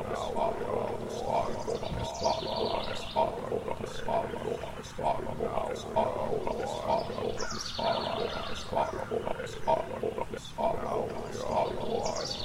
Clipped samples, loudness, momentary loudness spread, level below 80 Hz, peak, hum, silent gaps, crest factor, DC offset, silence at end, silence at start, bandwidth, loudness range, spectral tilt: under 0.1%; -33 LUFS; 5 LU; -48 dBFS; -14 dBFS; none; none; 18 dB; under 0.1%; 0 s; 0 s; 16 kHz; 1 LU; -4.5 dB/octave